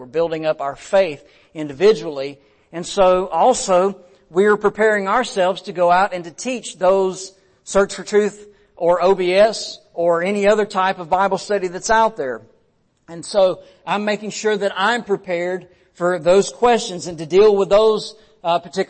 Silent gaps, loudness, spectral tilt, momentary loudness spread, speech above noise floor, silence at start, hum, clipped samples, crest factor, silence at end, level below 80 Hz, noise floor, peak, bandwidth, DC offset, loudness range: none; -18 LUFS; -4 dB/octave; 14 LU; 44 dB; 0 s; none; under 0.1%; 14 dB; 0.05 s; -50 dBFS; -62 dBFS; -4 dBFS; 8.8 kHz; under 0.1%; 4 LU